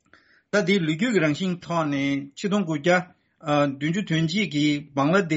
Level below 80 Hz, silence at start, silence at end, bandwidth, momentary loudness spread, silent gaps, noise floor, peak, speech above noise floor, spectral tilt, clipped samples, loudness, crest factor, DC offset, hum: -64 dBFS; 0.55 s; 0 s; 8 kHz; 5 LU; none; -58 dBFS; -6 dBFS; 35 dB; -4.5 dB/octave; under 0.1%; -24 LUFS; 16 dB; under 0.1%; none